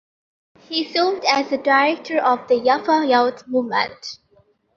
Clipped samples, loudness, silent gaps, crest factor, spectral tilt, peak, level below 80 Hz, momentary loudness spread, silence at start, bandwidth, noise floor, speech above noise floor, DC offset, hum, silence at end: under 0.1%; -19 LUFS; none; 18 dB; -3 dB/octave; -2 dBFS; -68 dBFS; 9 LU; 0.7 s; 7.4 kHz; -58 dBFS; 40 dB; under 0.1%; none; 0.65 s